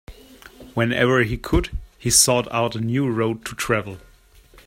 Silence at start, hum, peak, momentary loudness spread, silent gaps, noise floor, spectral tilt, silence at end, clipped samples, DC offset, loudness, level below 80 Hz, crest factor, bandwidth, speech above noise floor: 0.1 s; none; -2 dBFS; 13 LU; none; -51 dBFS; -3.5 dB/octave; 0.7 s; under 0.1%; under 0.1%; -20 LUFS; -36 dBFS; 22 dB; 16.5 kHz; 30 dB